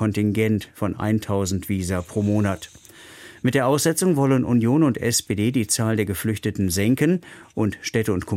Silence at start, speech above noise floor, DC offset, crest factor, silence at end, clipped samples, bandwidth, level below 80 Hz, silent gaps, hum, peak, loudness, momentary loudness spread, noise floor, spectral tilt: 0 s; 23 dB; under 0.1%; 14 dB; 0 s; under 0.1%; 16.5 kHz; -50 dBFS; none; none; -6 dBFS; -22 LUFS; 7 LU; -44 dBFS; -5.5 dB/octave